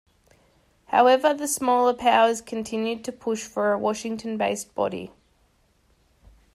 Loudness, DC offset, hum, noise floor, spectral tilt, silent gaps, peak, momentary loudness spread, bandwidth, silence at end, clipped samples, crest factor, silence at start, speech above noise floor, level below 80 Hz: -23 LUFS; under 0.1%; none; -64 dBFS; -3.5 dB/octave; none; -6 dBFS; 12 LU; 16 kHz; 1.45 s; under 0.1%; 18 dB; 0.9 s; 41 dB; -62 dBFS